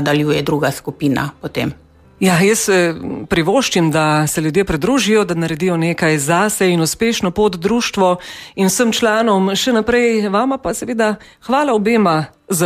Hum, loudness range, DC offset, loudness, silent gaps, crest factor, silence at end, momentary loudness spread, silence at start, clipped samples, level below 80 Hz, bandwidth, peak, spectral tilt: none; 1 LU; under 0.1%; -15 LUFS; none; 12 dB; 0 s; 7 LU; 0 s; under 0.1%; -44 dBFS; 15.5 kHz; -2 dBFS; -4.5 dB/octave